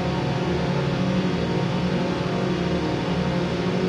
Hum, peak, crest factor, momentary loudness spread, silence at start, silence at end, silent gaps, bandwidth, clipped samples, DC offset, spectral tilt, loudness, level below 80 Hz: none; -12 dBFS; 12 dB; 1 LU; 0 s; 0 s; none; 10 kHz; under 0.1%; under 0.1%; -7 dB/octave; -24 LUFS; -42 dBFS